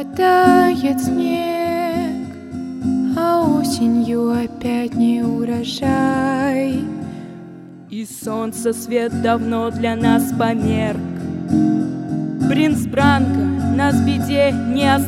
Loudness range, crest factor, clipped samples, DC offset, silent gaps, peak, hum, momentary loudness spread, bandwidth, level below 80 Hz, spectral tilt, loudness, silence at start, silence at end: 4 LU; 18 dB; under 0.1%; under 0.1%; none; 0 dBFS; none; 12 LU; 16 kHz; -46 dBFS; -6 dB/octave; -18 LUFS; 0 s; 0 s